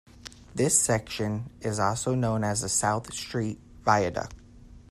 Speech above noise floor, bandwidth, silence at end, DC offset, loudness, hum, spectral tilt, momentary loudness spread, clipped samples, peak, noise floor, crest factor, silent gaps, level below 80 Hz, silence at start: 23 dB; 15.5 kHz; 0.1 s; under 0.1%; -27 LUFS; none; -4 dB/octave; 13 LU; under 0.1%; -6 dBFS; -49 dBFS; 22 dB; none; -52 dBFS; 0.15 s